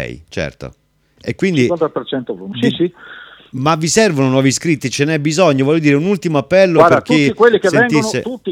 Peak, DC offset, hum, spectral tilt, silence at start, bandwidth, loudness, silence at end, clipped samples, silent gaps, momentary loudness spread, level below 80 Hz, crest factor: 0 dBFS; under 0.1%; none; -5 dB/octave; 0 s; 16 kHz; -14 LUFS; 0 s; under 0.1%; none; 14 LU; -48 dBFS; 14 dB